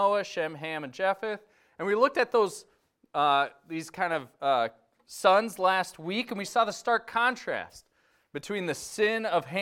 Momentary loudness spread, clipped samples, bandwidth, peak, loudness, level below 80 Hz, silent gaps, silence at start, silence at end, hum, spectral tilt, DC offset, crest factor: 12 LU; under 0.1%; 16.5 kHz; -8 dBFS; -28 LUFS; -72 dBFS; none; 0 s; 0 s; none; -3.5 dB/octave; under 0.1%; 20 dB